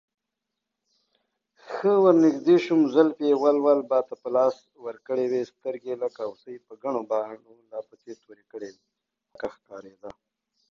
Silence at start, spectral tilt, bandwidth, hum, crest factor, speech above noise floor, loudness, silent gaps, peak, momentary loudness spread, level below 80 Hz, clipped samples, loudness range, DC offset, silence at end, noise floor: 1.7 s; -7 dB/octave; 7.2 kHz; none; 20 dB; 60 dB; -23 LUFS; none; -6 dBFS; 24 LU; -74 dBFS; under 0.1%; 14 LU; under 0.1%; 0.6 s; -85 dBFS